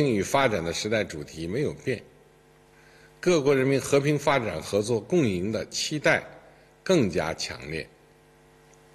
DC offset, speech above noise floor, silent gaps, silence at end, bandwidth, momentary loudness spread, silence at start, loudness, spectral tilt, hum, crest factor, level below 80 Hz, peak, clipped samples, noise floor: under 0.1%; 31 dB; none; 1.1 s; 13 kHz; 12 LU; 0 s; -26 LUFS; -5 dB/octave; none; 20 dB; -56 dBFS; -8 dBFS; under 0.1%; -57 dBFS